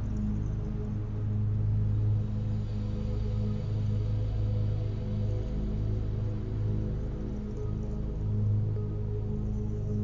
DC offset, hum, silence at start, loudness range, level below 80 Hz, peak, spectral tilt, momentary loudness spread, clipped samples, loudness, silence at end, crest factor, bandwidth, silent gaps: under 0.1%; none; 0 s; 2 LU; -36 dBFS; -18 dBFS; -10 dB/octave; 5 LU; under 0.1%; -32 LUFS; 0 s; 10 dB; 6.8 kHz; none